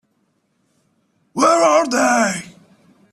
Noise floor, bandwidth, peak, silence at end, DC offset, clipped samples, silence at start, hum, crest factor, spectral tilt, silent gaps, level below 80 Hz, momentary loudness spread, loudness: -66 dBFS; 14 kHz; -4 dBFS; 0.65 s; under 0.1%; under 0.1%; 1.35 s; none; 16 dB; -3 dB/octave; none; -66 dBFS; 13 LU; -15 LUFS